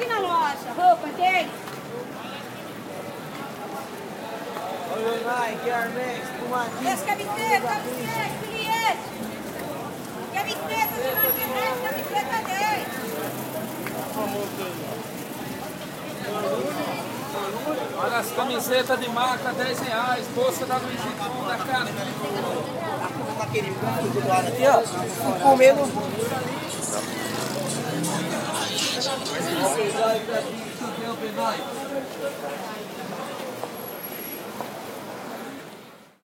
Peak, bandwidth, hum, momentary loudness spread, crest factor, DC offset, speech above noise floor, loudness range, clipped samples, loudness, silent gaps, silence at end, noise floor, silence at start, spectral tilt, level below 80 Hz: -4 dBFS; 16.5 kHz; none; 12 LU; 22 dB; under 0.1%; 21 dB; 9 LU; under 0.1%; -26 LUFS; none; 0.2 s; -46 dBFS; 0 s; -3.5 dB/octave; -66 dBFS